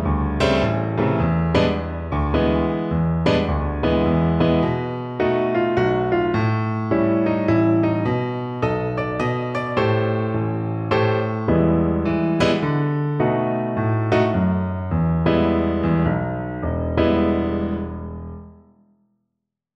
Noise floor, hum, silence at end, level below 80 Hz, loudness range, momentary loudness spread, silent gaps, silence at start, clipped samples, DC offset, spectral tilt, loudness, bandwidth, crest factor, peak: -79 dBFS; none; 1.2 s; -34 dBFS; 2 LU; 6 LU; none; 0 s; under 0.1%; under 0.1%; -8.5 dB/octave; -20 LUFS; 8.6 kHz; 16 dB; -4 dBFS